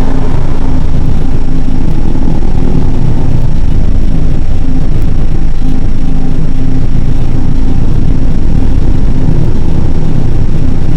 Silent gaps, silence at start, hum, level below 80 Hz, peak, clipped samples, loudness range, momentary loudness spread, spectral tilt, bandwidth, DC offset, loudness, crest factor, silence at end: none; 0 s; none; -6 dBFS; 0 dBFS; 10%; 2 LU; 3 LU; -8.5 dB/octave; 3.1 kHz; 3%; -14 LUFS; 4 dB; 0 s